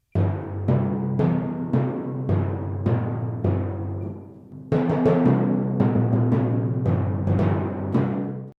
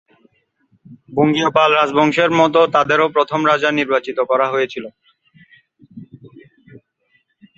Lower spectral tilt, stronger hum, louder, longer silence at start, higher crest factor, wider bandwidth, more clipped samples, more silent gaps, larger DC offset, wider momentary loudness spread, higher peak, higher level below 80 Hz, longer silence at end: first, -11 dB/octave vs -5.5 dB/octave; neither; second, -23 LUFS vs -15 LUFS; second, 0.15 s vs 0.9 s; about the same, 16 dB vs 18 dB; second, 4.8 kHz vs 7.8 kHz; neither; neither; neither; about the same, 9 LU vs 8 LU; second, -8 dBFS vs 0 dBFS; first, -52 dBFS vs -60 dBFS; second, 0.1 s vs 1.3 s